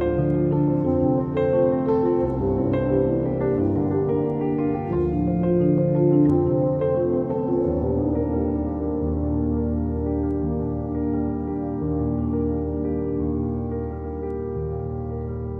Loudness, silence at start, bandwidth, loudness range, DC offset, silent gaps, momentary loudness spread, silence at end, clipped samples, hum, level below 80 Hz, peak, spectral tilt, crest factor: -23 LUFS; 0 s; 4 kHz; 5 LU; under 0.1%; none; 8 LU; 0 s; under 0.1%; none; -36 dBFS; -8 dBFS; -12.5 dB/octave; 14 dB